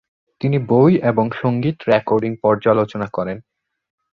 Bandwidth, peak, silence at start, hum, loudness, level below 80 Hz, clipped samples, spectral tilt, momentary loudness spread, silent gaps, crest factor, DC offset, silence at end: 6.8 kHz; -2 dBFS; 0.4 s; none; -18 LUFS; -54 dBFS; under 0.1%; -9.5 dB/octave; 11 LU; none; 16 dB; under 0.1%; 0.75 s